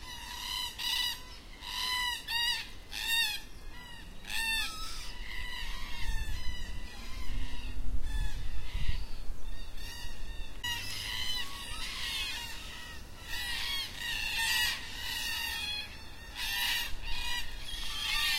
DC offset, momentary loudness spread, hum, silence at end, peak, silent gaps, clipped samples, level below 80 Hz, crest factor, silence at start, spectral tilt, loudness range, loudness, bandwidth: under 0.1%; 15 LU; none; 0 s; -16 dBFS; none; under 0.1%; -40 dBFS; 16 dB; 0 s; -1 dB/octave; 9 LU; -35 LUFS; 16 kHz